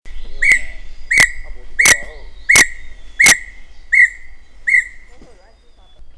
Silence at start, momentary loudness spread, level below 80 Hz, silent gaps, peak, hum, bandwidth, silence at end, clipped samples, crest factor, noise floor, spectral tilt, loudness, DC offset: 0.05 s; 9 LU; -32 dBFS; none; 0 dBFS; none; 11 kHz; 0.05 s; under 0.1%; 16 dB; -44 dBFS; 0.5 dB/octave; -12 LUFS; under 0.1%